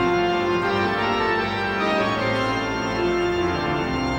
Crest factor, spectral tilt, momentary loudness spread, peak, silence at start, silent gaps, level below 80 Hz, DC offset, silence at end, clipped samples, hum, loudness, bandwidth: 12 dB; -5.5 dB/octave; 3 LU; -10 dBFS; 0 s; none; -42 dBFS; under 0.1%; 0 s; under 0.1%; none; -22 LUFS; over 20 kHz